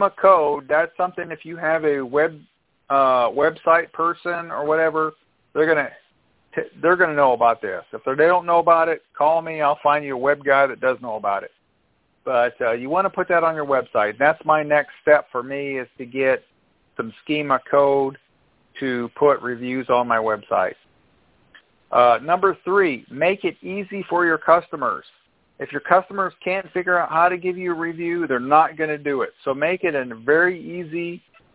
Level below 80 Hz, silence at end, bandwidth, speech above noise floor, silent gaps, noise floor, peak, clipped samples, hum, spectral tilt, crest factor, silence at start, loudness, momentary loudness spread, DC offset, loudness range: -64 dBFS; 0.35 s; 4 kHz; 45 dB; none; -65 dBFS; 0 dBFS; under 0.1%; none; -9 dB/octave; 20 dB; 0 s; -20 LUFS; 12 LU; under 0.1%; 4 LU